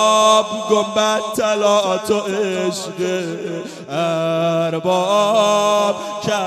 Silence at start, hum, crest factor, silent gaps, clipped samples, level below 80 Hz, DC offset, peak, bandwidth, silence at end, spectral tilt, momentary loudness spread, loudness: 0 s; none; 16 dB; none; under 0.1%; -64 dBFS; under 0.1%; -2 dBFS; 14.5 kHz; 0 s; -3.5 dB/octave; 9 LU; -17 LUFS